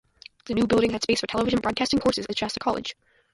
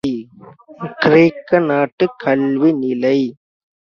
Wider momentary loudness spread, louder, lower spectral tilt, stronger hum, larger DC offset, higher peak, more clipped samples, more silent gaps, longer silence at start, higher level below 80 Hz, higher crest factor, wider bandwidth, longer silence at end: second, 8 LU vs 13 LU; second, -25 LUFS vs -15 LUFS; second, -4.5 dB/octave vs -8 dB/octave; neither; neither; second, -10 dBFS vs 0 dBFS; neither; second, none vs 1.92-1.98 s; first, 0.45 s vs 0.05 s; first, -50 dBFS vs -58 dBFS; about the same, 16 dB vs 16 dB; first, 11.5 kHz vs 6.8 kHz; second, 0.4 s vs 0.55 s